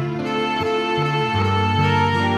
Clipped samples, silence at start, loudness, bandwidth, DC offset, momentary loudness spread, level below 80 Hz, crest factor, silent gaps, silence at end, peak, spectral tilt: under 0.1%; 0 s; -19 LUFS; 10.5 kHz; under 0.1%; 4 LU; -50 dBFS; 12 dB; none; 0 s; -8 dBFS; -6.5 dB/octave